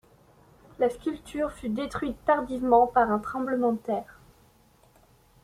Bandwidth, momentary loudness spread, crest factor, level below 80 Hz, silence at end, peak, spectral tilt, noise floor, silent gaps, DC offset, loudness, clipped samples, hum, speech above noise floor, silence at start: 14.5 kHz; 11 LU; 20 dB; -54 dBFS; 1.3 s; -8 dBFS; -6.5 dB/octave; -60 dBFS; none; under 0.1%; -27 LUFS; under 0.1%; none; 34 dB; 0.8 s